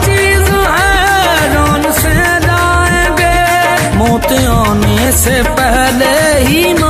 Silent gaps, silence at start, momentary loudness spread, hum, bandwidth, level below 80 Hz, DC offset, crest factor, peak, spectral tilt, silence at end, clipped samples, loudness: none; 0 s; 2 LU; none; 16 kHz; -18 dBFS; under 0.1%; 10 dB; 0 dBFS; -4 dB/octave; 0 s; under 0.1%; -9 LUFS